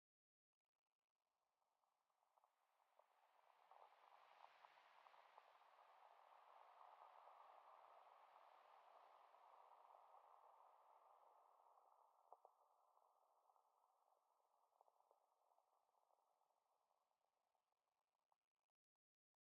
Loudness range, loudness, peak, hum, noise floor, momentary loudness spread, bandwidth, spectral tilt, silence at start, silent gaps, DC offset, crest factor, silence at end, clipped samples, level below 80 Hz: 0 LU; -69 LUFS; -48 dBFS; none; under -90 dBFS; 2 LU; 5 kHz; 2 dB/octave; 1.35 s; none; under 0.1%; 26 dB; 1.1 s; under 0.1%; under -90 dBFS